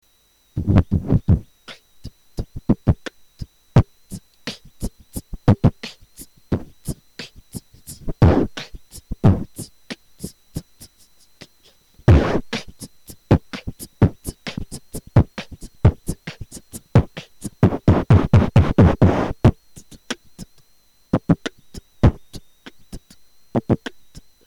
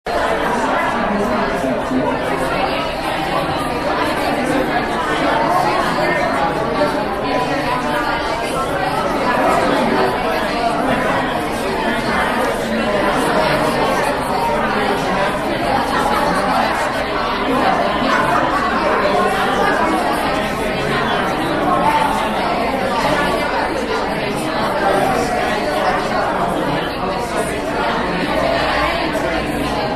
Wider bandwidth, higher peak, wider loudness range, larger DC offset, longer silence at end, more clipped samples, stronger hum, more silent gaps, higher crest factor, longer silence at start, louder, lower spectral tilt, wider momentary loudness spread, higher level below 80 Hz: about the same, 14 kHz vs 13.5 kHz; second, -6 dBFS vs -2 dBFS; first, 8 LU vs 2 LU; second, under 0.1% vs 0.4%; first, 0.7 s vs 0 s; neither; neither; neither; about the same, 14 dB vs 16 dB; first, 0.55 s vs 0.05 s; about the same, -19 LUFS vs -17 LUFS; first, -7.5 dB/octave vs -4.5 dB/octave; first, 23 LU vs 4 LU; first, -30 dBFS vs -36 dBFS